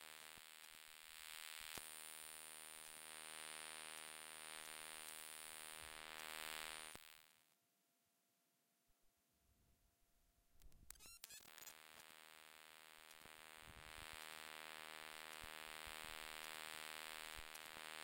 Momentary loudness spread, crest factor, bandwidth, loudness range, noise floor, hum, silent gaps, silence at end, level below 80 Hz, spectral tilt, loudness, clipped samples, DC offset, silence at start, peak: 10 LU; 32 dB; 16 kHz; 10 LU; -84 dBFS; none; none; 0 s; -76 dBFS; 0 dB/octave; -54 LUFS; under 0.1%; under 0.1%; 0 s; -26 dBFS